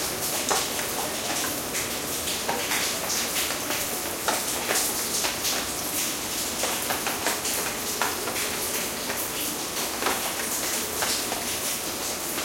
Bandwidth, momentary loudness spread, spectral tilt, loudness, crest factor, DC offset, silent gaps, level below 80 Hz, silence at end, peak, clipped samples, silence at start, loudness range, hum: 16.5 kHz; 3 LU; -1 dB/octave; -26 LUFS; 22 dB; under 0.1%; none; -54 dBFS; 0 s; -6 dBFS; under 0.1%; 0 s; 1 LU; none